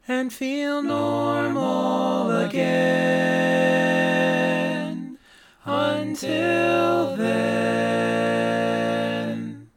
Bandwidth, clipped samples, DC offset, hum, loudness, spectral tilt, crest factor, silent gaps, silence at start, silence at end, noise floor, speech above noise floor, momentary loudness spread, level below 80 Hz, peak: 18 kHz; under 0.1%; under 0.1%; none; -22 LUFS; -5.5 dB/octave; 14 dB; none; 0.1 s; 0.1 s; -52 dBFS; 30 dB; 7 LU; -68 dBFS; -8 dBFS